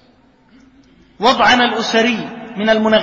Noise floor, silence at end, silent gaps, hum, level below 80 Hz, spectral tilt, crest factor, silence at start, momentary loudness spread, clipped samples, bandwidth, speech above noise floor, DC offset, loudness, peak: -51 dBFS; 0 s; none; none; -50 dBFS; -3.5 dB/octave; 16 dB; 1.2 s; 10 LU; under 0.1%; 7.8 kHz; 38 dB; under 0.1%; -14 LUFS; 0 dBFS